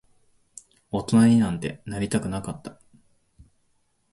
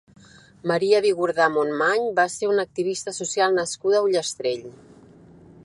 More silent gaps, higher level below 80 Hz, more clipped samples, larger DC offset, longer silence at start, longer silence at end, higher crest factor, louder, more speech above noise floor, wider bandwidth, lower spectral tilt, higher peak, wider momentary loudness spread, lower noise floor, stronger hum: neither; first, -52 dBFS vs -66 dBFS; neither; neither; first, 0.95 s vs 0.65 s; first, 1.4 s vs 0.9 s; about the same, 18 dB vs 18 dB; about the same, -23 LUFS vs -22 LUFS; first, 46 dB vs 27 dB; about the same, 11.5 kHz vs 11.5 kHz; first, -6.5 dB/octave vs -3.5 dB/octave; second, -8 dBFS vs -4 dBFS; first, 18 LU vs 8 LU; first, -68 dBFS vs -49 dBFS; neither